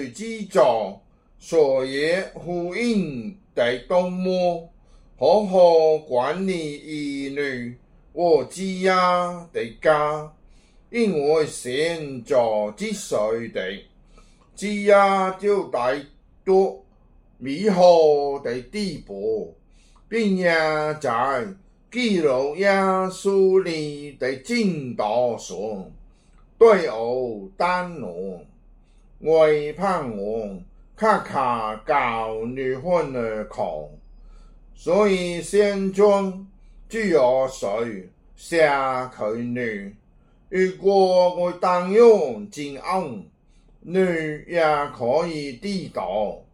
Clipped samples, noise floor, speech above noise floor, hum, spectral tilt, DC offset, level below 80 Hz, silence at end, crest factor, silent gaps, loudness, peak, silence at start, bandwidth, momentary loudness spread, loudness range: under 0.1%; -54 dBFS; 33 dB; none; -5.5 dB/octave; under 0.1%; -52 dBFS; 0.15 s; 18 dB; none; -22 LUFS; -4 dBFS; 0 s; 12 kHz; 14 LU; 4 LU